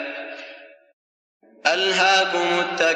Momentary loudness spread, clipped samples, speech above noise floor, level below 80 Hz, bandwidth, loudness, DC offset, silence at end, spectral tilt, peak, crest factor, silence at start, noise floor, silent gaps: 19 LU; under 0.1%; 24 dB; -88 dBFS; 10 kHz; -19 LUFS; under 0.1%; 0 s; -2 dB/octave; -4 dBFS; 18 dB; 0 s; -44 dBFS; 0.93-1.40 s